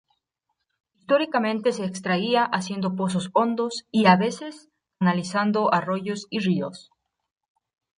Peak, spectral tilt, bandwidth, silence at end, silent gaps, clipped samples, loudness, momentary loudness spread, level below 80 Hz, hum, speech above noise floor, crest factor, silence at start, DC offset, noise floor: -4 dBFS; -5.5 dB/octave; 10.5 kHz; 1.15 s; none; under 0.1%; -23 LUFS; 8 LU; -70 dBFS; none; 56 dB; 20 dB; 1.1 s; under 0.1%; -79 dBFS